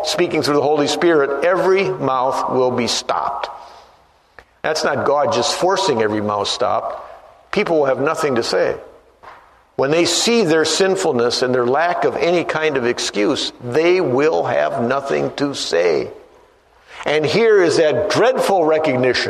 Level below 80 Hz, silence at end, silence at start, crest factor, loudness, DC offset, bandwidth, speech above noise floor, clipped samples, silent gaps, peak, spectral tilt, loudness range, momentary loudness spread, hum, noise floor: -56 dBFS; 0 s; 0 s; 16 dB; -17 LUFS; under 0.1%; 13.5 kHz; 36 dB; under 0.1%; none; -2 dBFS; -4 dB/octave; 4 LU; 7 LU; none; -52 dBFS